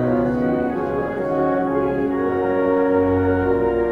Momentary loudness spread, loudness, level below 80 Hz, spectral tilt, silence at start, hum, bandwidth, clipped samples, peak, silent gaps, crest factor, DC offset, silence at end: 5 LU; -20 LUFS; -42 dBFS; -9.5 dB/octave; 0 s; none; 5.2 kHz; under 0.1%; -8 dBFS; none; 12 dB; under 0.1%; 0 s